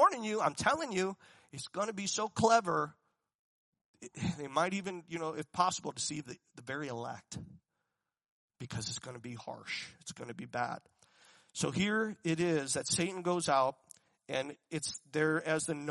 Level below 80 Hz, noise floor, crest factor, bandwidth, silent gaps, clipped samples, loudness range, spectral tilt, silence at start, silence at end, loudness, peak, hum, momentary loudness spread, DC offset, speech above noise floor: -72 dBFS; -86 dBFS; 22 dB; 11.5 kHz; 3.35-3.72 s, 3.81-3.94 s, 8.30-8.48 s; under 0.1%; 10 LU; -4 dB/octave; 0 s; 0 s; -35 LUFS; -14 dBFS; none; 15 LU; under 0.1%; 51 dB